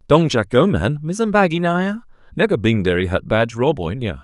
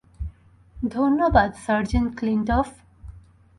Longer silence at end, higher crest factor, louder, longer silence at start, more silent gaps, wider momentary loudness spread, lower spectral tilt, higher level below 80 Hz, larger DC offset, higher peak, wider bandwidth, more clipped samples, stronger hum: second, 0.05 s vs 0.4 s; about the same, 18 dB vs 20 dB; first, -18 LUFS vs -22 LUFS; about the same, 0.1 s vs 0.2 s; neither; second, 8 LU vs 17 LU; about the same, -6.5 dB/octave vs -7 dB/octave; about the same, -40 dBFS vs -36 dBFS; neither; first, 0 dBFS vs -4 dBFS; about the same, 11.5 kHz vs 11.5 kHz; neither; neither